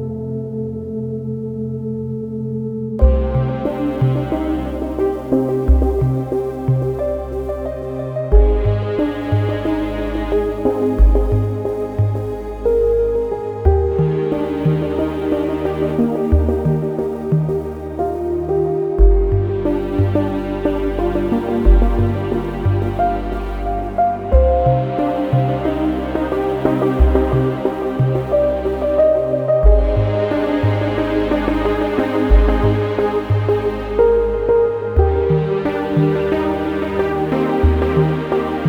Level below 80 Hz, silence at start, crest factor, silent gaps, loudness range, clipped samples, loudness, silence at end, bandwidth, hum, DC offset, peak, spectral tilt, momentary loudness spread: -22 dBFS; 0 s; 16 dB; none; 3 LU; under 0.1%; -18 LUFS; 0 s; 5.6 kHz; none; under 0.1%; 0 dBFS; -9.5 dB/octave; 9 LU